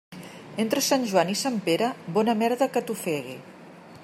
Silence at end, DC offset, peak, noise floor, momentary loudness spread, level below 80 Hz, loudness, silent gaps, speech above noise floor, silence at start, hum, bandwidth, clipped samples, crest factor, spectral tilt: 0 s; under 0.1%; -8 dBFS; -46 dBFS; 16 LU; -74 dBFS; -25 LUFS; none; 21 dB; 0.1 s; none; 16 kHz; under 0.1%; 20 dB; -4 dB/octave